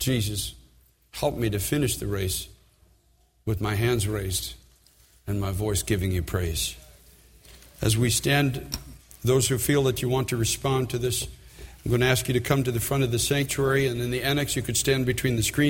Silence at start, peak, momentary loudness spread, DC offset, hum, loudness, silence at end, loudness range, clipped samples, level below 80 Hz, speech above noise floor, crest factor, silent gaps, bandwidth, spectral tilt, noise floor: 0 s; -6 dBFS; 11 LU; under 0.1%; none; -25 LUFS; 0 s; 5 LU; under 0.1%; -44 dBFS; 38 dB; 20 dB; none; 17 kHz; -4.5 dB/octave; -63 dBFS